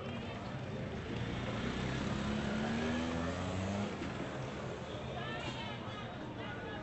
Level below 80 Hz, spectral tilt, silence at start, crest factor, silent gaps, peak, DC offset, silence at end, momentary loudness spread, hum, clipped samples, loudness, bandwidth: -54 dBFS; -6 dB/octave; 0 s; 14 dB; none; -26 dBFS; under 0.1%; 0 s; 7 LU; none; under 0.1%; -40 LUFS; 8.2 kHz